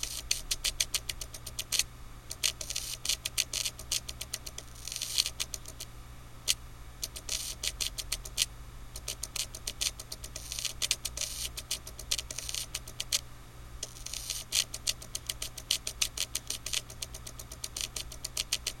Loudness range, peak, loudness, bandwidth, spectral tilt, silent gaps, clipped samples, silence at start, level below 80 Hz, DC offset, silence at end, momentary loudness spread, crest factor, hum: 2 LU; -8 dBFS; -34 LUFS; 16.5 kHz; 0 dB/octave; none; under 0.1%; 0 s; -48 dBFS; under 0.1%; 0 s; 12 LU; 30 dB; none